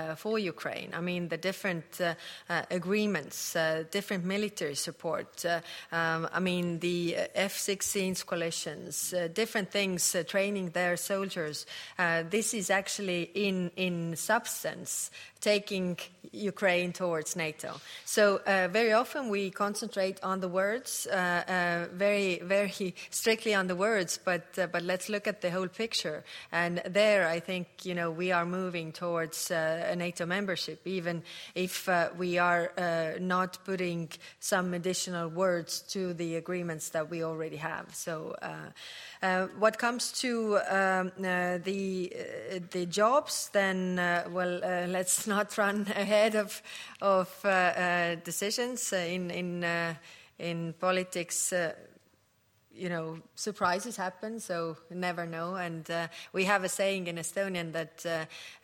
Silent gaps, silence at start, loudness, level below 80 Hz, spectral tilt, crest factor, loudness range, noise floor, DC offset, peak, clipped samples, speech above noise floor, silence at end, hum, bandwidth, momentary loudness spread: none; 0 s; -31 LUFS; -76 dBFS; -3.5 dB/octave; 20 dB; 4 LU; -69 dBFS; under 0.1%; -12 dBFS; under 0.1%; 38 dB; 0.05 s; none; 16.5 kHz; 9 LU